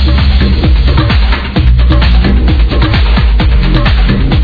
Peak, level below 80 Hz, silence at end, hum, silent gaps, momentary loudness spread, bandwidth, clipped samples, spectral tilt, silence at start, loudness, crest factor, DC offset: 0 dBFS; -8 dBFS; 0 s; none; none; 2 LU; 5 kHz; 0.7%; -8.5 dB/octave; 0 s; -9 LUFS; 6 dB; under 0.1%